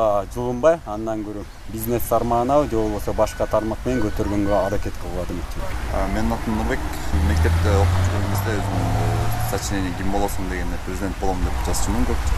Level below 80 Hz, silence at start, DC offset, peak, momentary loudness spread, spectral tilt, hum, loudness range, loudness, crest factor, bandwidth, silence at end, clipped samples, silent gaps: -28 dBFS; 0 s; under 0.1%; -4 dBFS; 10 LU; -6 dB/octave; none; 3 LU; -23 LUFS; 16 dB; 15 kHz; 0 s; under 0.1%; none